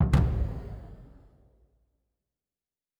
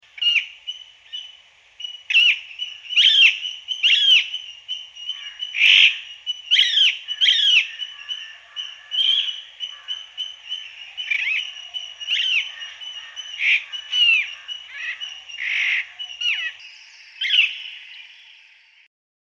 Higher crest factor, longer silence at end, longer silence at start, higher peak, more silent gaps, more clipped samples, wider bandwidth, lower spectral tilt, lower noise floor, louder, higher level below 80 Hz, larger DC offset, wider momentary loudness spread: about the same, 22 dB vs 20 dB; first, 1.95 s vs 1.2 s; second, 0 s vs 0.15 s; second, -8 dBFS vs -4 dBFS; neither; neither; about the same, 11 kHz vs 10 kHz; first, -8 dB/octave vs 5.5 dB/octave; first, under -90 dBFS vs -52 dBFS; second, -29 LUFS vs -17 LUFS; first, -34 dBFS vs -76 dBFS; neither; first, 25 LU vs 20 LU